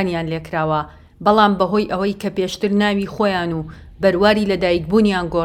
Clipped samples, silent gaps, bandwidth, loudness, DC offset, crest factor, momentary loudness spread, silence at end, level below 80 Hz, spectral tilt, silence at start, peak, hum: under 0.1%; none; 14 kHz; -18 LUFS; under 0.1%; 18 dB; 9 LU; 0 s; -42 dBFS; -6.5 dB/octave; 0 s; 0 dBFS; none